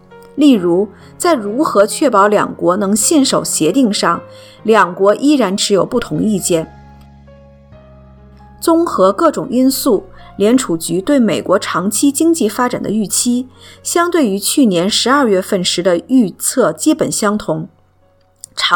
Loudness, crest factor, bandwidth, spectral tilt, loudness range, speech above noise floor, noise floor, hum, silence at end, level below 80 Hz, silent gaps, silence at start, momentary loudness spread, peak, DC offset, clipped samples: -13 LUFS; 14 dB; 19 kHz; -4 dB/octave; 4 LU; 39 dB; -52 dBFS; none; 0 s; -48 dBFS; none; 0.1 s; 7 LU; 0 dBFS; under 0.1%; under 0.1%